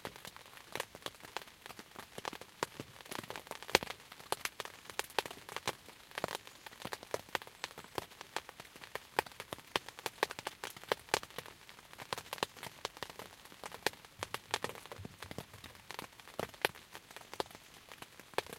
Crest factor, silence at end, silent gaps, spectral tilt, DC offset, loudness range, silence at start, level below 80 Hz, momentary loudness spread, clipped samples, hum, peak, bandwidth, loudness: 42 dB; 0 s; none; -2 dB/octave; under 0.1%; 5 LU; 0 s; -70 dBFS; 14 LU; under 0.1%; none; 0 dBFS; 17 kHz; -42 LUFS